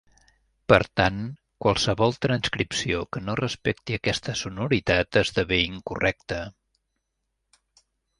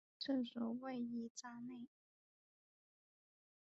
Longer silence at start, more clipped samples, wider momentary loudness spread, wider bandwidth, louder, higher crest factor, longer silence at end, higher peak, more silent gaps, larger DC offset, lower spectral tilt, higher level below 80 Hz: first, 0.7 s vs 0.2 s; neither; about the same, 11 LU vs 12 LU; first, 11.5 kHz vs 7.6 kHz; first, -25 LUFS vs -46 LUFS; first, 24 dB vs 18 dB; second, 1.7 s vs 1.95 s; first, -2 dBFS vs -30 dBFS; second, none vs 1.30-1.35 s; neither; about the same, -4.5 dB/octave vs -3.5 dB/octave; first, -46 dBFS vs -90 dBFS